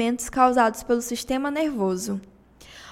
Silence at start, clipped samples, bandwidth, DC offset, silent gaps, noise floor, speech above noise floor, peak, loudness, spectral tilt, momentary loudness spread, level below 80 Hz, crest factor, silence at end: 0 s; under 0.1%; 16.5 kHz; under 0.1%; none; -48 dBFS; 25 dB; -6 dBFS; -24 LUFS; -4 dB/octave; 12 LU; -50 dBFS; 18 dB; 0 s